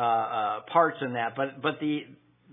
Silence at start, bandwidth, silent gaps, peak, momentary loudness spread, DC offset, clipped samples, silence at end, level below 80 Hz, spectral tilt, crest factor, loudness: 0 s; 3.9 kHz; none; -10 dBFS; 7 LU; under 0.1%; under 0.1%; 0.4 s; -82 dBFS; -9 dB/octave; 18 dB; -28 LUFS